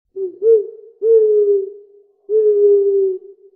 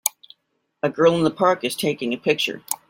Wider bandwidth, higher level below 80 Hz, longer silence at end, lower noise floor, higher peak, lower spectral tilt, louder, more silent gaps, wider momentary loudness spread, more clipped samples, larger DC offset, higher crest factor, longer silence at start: second, 1.4 kHz vs 17 kHz; second, -80 dBFS vs -66 dBFS; about the same, 0.25 s vs 0.15 s; second, -47 dBFS vs -72 dBFS; second, -4 dBFS vs 0 dBFS; first, -9.5 dB/octave vs -4 dB/octave; first, -15 LUFS vs -21 LUFS; neither; first, 16 LU vs 8 LU; neither; neither; second, 12 dB vs 22 dB; about the same, 0.15 s vs 0.05 s